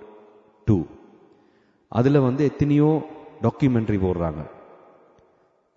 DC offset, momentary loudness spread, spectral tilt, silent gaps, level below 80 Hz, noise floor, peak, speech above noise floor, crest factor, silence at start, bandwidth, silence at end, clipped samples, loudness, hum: under 0.1%; 15 LU; -9.5 dB/octave; none; -46 dBFS; -62 dBFS; -6 dBFS; 42 dB; 18 dB; 0 s; 7.2 kHz; 1.25 s; under 0.1%; -22 LUFS; none